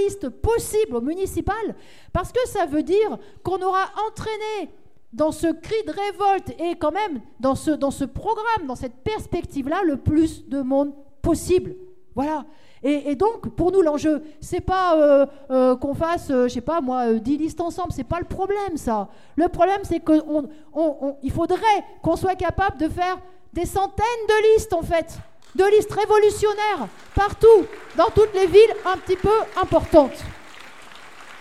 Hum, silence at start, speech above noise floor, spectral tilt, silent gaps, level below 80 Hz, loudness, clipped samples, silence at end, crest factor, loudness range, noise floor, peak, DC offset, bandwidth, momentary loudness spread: none; 0 s; 23 dB; -5.5 dB/octave; none; -42 dBFS; -21 LUFS; under 0.1%; 0.05 s; 18 dB; 7 LU; -44 dBFS; -2 dBFS; 0.6%; 15 kHz; 12 LU